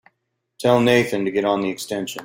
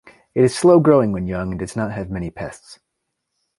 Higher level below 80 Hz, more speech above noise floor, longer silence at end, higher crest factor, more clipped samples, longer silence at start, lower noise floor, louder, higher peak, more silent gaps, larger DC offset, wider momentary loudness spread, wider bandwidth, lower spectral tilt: second, -60 dBFS vs -44 dBFS; second, 55 dB vs 59 dB; second, 0 s vs 0.85 s; about the same, 18 dB vs 18 dB; neither; first, 0.6 s vs 0.35 s; about the same, -75 dBFS vs -77 dBFS; about the same, -20 LUFS vs -18 LUFS; about the same, -2 dBFS vs -2 dBFS; neither; neither; second, 10 LU vs 16 LU; first, 16.5 kHz vs 11.5 kHz; second, -5 dB/octave vs -7 dB/octave